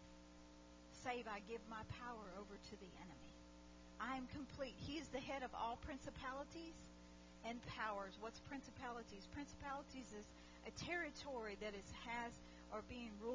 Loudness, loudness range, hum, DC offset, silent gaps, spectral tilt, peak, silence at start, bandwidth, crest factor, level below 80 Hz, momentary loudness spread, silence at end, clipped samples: -51 LUFS; 3 LU; 60 Hz at -65 dBFS; under 0.1%; none; -4.5 dB/octave; -32 dBFS; 0 s; 7.8 kHz; 20 dB; -66 dBFS; 15 LU; 0 s; under 0.1%